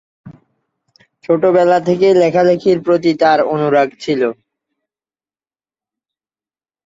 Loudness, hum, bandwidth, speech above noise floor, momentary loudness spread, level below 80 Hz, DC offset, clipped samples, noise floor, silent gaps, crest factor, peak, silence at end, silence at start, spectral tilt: -13 LUFS; none; 7.8 kHz; over 78 dB; 7 LU; -60 dBFS; under 0.1%; under 0.1%; under -90 dBFS; none; 16 dB; 0 dBFS; 2.55 s; 0.25 s; -7 dB/octave